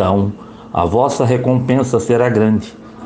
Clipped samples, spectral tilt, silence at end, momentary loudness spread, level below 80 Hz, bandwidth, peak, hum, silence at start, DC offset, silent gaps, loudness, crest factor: under 0.1%; -7.5 dB/octave; 0 s; 9 LU; -46 dBFS; 9.4 kHz; 0 dBFS; none; 0 s; under 0.1%; none; -15 LUFS; 14 dB